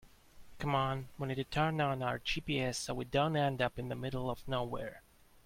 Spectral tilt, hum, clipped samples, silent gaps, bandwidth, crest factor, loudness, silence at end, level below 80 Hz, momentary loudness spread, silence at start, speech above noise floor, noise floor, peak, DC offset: -5.5 dB/octave; none; under 0.1%; none; 16.5 kHz; 18 dB; -36 LUFS; 0.45 s; -56 dBFS; 8 LU; 0.05 s; 20 dB; -55 dBFS; -18 dBFS; under 0.1%